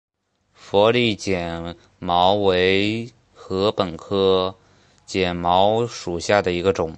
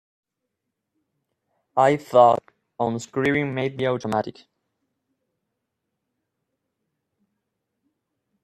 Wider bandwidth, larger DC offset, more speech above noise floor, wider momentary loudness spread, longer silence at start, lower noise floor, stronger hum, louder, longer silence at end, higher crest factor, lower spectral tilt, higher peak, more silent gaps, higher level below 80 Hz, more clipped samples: second, 8.8 kHz vs 13 kHz; neither; second, 43 dB vs 61 dB; about the same, 12 LU vs 11 LU; second, 0.65 s vs 1.75 s; second, -63 dBFS vs -81 dBFS; neither; about the same, -20 LUFS vs -22 LUFS; second, 0 s vs 4.1 s; second, 18 dB vs 24 dB; about the same, -5 dB/octave vs -6 dB/octave; about the same, -2 dBFS vs -2 dBFS; neither; first, -46 dBFS vs -66 dBFS; neither